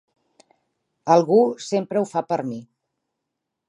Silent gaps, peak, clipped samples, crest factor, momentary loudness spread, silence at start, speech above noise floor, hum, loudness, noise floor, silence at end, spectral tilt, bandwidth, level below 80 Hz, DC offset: none; -4 dBFS; under 0.1%; 20 dB; 16 LU; 1.05 s; 61 dB; none; -21 LUFS; -81 dBFS; 1.05 s; -6.5 dB/octave; 11 kHz; -76 dBFS; under 0.1%